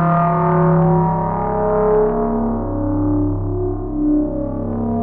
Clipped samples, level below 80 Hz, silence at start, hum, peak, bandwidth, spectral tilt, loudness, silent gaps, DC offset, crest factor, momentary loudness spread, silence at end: under 0.1%; -30 dBFS; 0 s; none; -4 dBFS; 3 kHz; -13.5 dB/octave; -18 LUFS; none; under 0.1%; 14 dB; 8 LU; 0 s